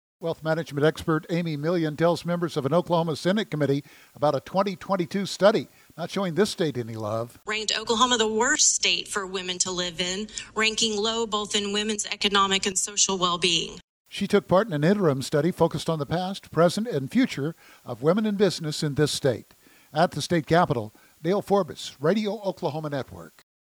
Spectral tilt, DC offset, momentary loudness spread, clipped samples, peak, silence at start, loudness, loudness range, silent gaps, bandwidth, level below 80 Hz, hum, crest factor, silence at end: -3.5 dB/octave; under 0.1%; 10 LU; under 0.1%; -6 dBFS; 0.2 s; -25 LUFS; 3 LU; 13.84-14.05 s; over 20 kHz; -58 dBFS; none; 20 dB; 0.35 s